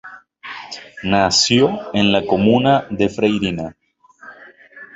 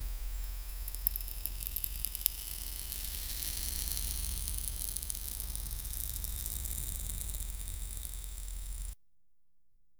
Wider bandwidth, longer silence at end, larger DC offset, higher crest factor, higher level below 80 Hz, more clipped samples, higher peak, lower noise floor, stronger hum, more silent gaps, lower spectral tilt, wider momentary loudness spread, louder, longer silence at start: second, 8 kHz vs over 20 kHz; about the same, 0.1 s vs 0.05 s; neither; second, 16 dB vs 38 dB; second, -48 dBFS vs -42 dBFS; neither; about the same, -2 dBFS vs 0 dBFS; second, -43 dBFS vs -78 dBFS; neither; neither; first, -4.5 dB/octave vs -1.5 dB/octave; first, 19 LU vs 9 LU; first, -16 LUFS vs -37 LUFS; about the same, 0.05 s vs 0 s